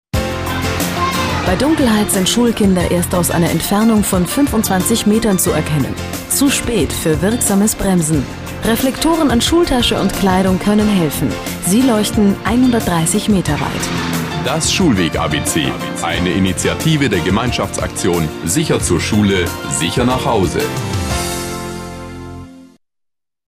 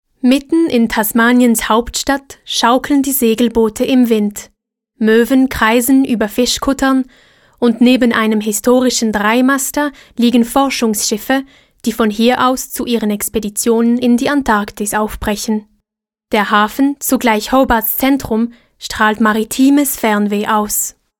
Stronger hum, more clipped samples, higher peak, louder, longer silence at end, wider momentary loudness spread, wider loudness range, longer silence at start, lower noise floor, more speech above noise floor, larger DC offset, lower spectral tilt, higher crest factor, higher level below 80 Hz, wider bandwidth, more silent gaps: neither; neither; about the same, -2 dBFS vs 0 dBFS; about the same, -15 LUFS vs -13 LUFS; first, 0.8 s vs 0.3 s; about the same, 6 LU vs 7 LU; about the same, 2 LU vs 2 LU; about the same, 0.15 s vs 0.25 s; about the same, -79 dBFS vs -82 dBFS; second, 65 dB vs 69 dB; neither; about the same, -4.5 dB/octave vs -3.5 dB/octave; about the same, 12 dB vs 14 dB; first, -32 dBFS vs -40 dBFS; about the same, 16 kHz vs 17.5 kHz; neither